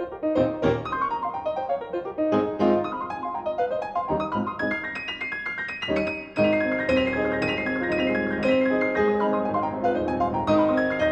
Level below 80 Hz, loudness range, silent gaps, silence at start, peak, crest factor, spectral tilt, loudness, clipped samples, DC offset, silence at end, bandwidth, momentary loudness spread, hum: -50 dBFS; 4 LU; none; 0 s; -8 dBFS; 16 dB; -7 dB/octave; -25 LUFS; under 0.1%; under 0.1%; 0 s; 8.4 kHz; 7 LU; none